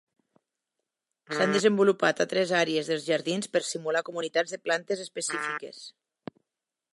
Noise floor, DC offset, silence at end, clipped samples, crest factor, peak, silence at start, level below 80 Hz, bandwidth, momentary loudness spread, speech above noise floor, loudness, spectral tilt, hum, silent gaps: -88 dBFS; under 0.1%; 1.05 s; under 0.1%; 20 dB; -8 dBFS; 1.3 s; -82 dBFS; 11.5 kHz; 21 LU; 61 dB; -27 LUFS; -3.5 dB/octave; none; none